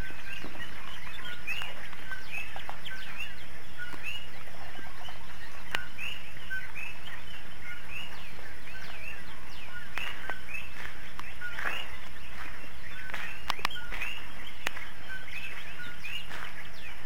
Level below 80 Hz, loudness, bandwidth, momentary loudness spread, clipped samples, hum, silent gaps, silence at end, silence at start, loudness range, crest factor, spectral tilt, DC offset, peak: -54 dBFS; -39 LUFS; 16 kHz; 9 LU; under 0.1%; none; none; 0 s; 0 s; 4 LU; 28 dB; -3 dB/octave; 7%; -10 dBFS